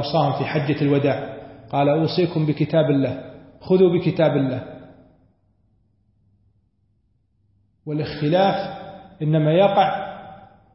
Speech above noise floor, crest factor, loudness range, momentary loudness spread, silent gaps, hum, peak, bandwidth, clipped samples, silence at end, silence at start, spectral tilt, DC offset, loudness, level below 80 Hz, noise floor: 46 dB; 16 dB; 9 LU; 20 LU; none; none; -4 dBFS; 5.8 kHz; under 0.1%; 0.3 s; 0 s; -11 dB/octave; under 0.1%; -20 LUFS; -58 dBFS; -65 dBFS